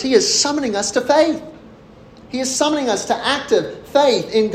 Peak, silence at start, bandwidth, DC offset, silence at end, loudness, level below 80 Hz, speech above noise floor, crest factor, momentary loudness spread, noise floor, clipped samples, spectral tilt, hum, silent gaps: -2 dBFS; 0 s; 15 kHz; under 0.1%; 0 s; -17 LUFS; -54 dBFS; 26 dB; 16 dB; 6 LU; -43 dBFS; under 0.1%; -2.5 dB/octave; none; none